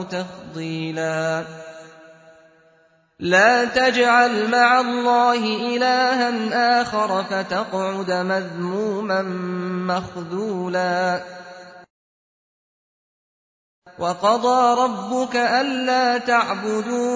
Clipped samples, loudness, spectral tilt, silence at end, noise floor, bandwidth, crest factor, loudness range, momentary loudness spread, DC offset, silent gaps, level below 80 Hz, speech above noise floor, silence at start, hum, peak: under 0.1%; -20 LUFS; -4.5 dB/octave; 0 s; -58 dBFS; 8 kHz; 18 dB; 10 LU; 13 LU; under 0.1%; 11.90-13.82 s; -62 dBFS; 38 dB; 0 s; none; -2 dBFS